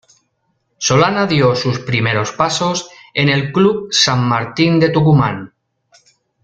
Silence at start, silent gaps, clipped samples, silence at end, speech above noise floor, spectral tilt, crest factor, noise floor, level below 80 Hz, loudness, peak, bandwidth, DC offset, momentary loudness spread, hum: 0.8 s; none; under 0.1%; 0.95 s; 52 dB; -5 dB/octave; 14 dB; -66 dBFS; -50 dBFS; -14 LUFS; 0 dBFS; 9.2 kHz; under 0.1%; 7 LU; none